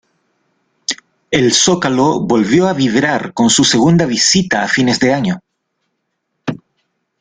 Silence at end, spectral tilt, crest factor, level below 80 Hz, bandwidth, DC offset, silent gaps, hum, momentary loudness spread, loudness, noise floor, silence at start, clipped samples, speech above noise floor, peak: 0.65 s; -3.5 dB/octave; 14 dB; -50 dBFS; 9.8 kHz; under 0.1%; none; none; 15 LU; -12 LUFS; -70 dBFS; 0.9 s; under 0.1%; 58 dB; 0 dBFS